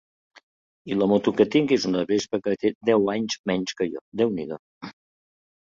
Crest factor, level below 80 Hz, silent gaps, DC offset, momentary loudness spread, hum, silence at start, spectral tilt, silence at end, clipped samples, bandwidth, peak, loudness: 20 dB; -62 dBFS; 2.75-2.81 s, 3.39-3.44 s, 4.01-4.12 s, 4.59-4.81 s; under 0.1%; 14 LU; none; 0.85 s; -5.5 dB/octave; 0.85 s; under 0.1%; 7.6 kHz; -6 dBFS; -24 LUFS